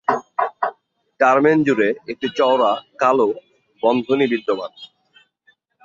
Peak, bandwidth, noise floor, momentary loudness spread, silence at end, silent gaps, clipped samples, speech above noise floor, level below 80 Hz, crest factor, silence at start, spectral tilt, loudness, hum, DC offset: -2 dBFS; 7.4 kHz; -60 dBFS; 11 LU; 1 s; none; under 0.1%; 43 dB; -66 dBFS; 18 dB; 0.1 s; -6 dB/octave; -19 LUFS; none; under 0.1%